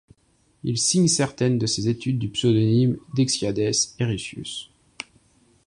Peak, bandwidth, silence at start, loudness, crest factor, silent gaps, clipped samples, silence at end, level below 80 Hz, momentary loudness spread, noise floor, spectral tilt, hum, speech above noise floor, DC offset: -6 dBFS; 11.5 kHz; 0.65 s; -22 LUFS; 18 dB; none; under 0.1%; 1.05 s; -54 dBFS; 15 LU; -63 dBFS; -4.5 dB/octave; none; 41 dB; under 0.1%